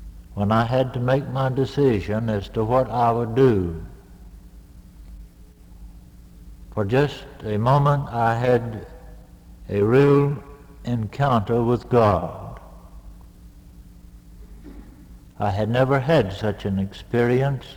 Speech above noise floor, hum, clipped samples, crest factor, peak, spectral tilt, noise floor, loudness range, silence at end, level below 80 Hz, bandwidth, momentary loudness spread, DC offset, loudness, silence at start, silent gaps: 25 dB; none; under 0.1%; 18 dB; -4 dBFS; -8 dB/octave; -46 dBFS; 9 LU; 0 s; -44 dBFS; 15 kHz; 15 LU; under 0.1%; -21 LUFS; 0 s; none